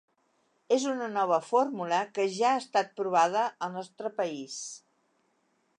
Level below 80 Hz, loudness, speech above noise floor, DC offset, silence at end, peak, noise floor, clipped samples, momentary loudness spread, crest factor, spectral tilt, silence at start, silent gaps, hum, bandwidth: -86 dBFS; -29 LUFS; 44 dB; under 0.1%; 1 s; -12 dBFS; -73 dBFS; under 0.1%; 11 LU; 18 dB; -3.5 dB/octave; 0.7 s; none; none; 11 kHz